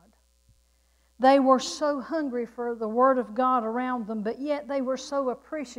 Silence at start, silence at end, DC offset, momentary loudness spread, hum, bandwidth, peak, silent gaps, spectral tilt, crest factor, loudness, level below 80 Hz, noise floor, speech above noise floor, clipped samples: 1.2 s; 0.05 s; under 0.1%; 11 LU; none; 11.5 kHz; -8 dBFS; none; -4.5 dB/octave; 18 dB; -26 LUFS; -66 dBFS; -65 dBFS; 40 dB; under 0.1%